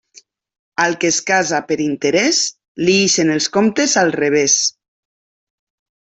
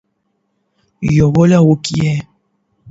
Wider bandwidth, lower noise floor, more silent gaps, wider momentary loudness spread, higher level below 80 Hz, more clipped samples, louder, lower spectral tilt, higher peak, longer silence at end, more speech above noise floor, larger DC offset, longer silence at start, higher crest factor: about the same, 8.4 kHz vs 8 kHz; second, -49 dBFS vs -66 dBFS; first, 2.68-2.75 s vs none; second, 7 LU vs 11 LU; second, -60 dBFS vs -42 dBFS; neither; about the same, -15 LUFS vs -13 LUFS; second, -2.5 dB/octave vs -7 dB/octave; about the same, -2 dBFS vs 0 dBFS; first, 1.45 s vs 0 s; second, 33 dB vs 55 dB; neither; second, 0.8 s vs 1 s; about the same, 16 dB vs 14 dB